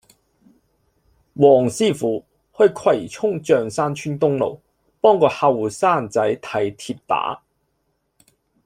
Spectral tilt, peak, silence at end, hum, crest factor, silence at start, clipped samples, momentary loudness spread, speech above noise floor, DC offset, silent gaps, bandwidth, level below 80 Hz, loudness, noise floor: -5.5 dB/octave; -2 dBFS; 1.3 s; none; 18 dB; 1.35 s; under 0.1%; 10 LU; 52 dB; under 0.1%; none; 15 kHz; -60 dBFS; -19 LUFS; -70 dBFS